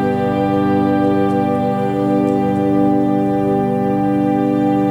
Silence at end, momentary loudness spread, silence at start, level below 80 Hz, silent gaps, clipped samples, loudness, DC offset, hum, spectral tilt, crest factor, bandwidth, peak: 0 s; 2 LU; 0 s; -48 dBFS; none; under 0.1%; -16 LUFS; under 0.1%; 50 Hz at -55 dBFS; -9 dB/octave; 12 dB; 9.6 kHz; -4 dBFS